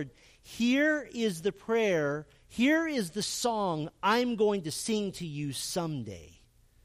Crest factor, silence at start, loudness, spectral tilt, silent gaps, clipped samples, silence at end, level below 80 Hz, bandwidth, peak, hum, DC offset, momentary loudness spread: 16 dB; 0 s; -30 LUFS; -4.5 dB/octave; none; under 0.1%; 0.55 s; -62 dBFS; 15.5 kHz; -14 dBFS; none; under 0.1%; 13 LU